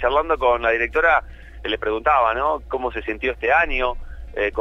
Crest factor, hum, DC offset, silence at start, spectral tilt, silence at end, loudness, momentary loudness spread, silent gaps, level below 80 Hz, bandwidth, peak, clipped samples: 16 dB; none; under 0.1%; 0 s; -6 dB/octave; 0 s; -20 LUFS; 9 LU; none; -36 dBFS; 7.2 kHz; -4 dBFS; under 0.1%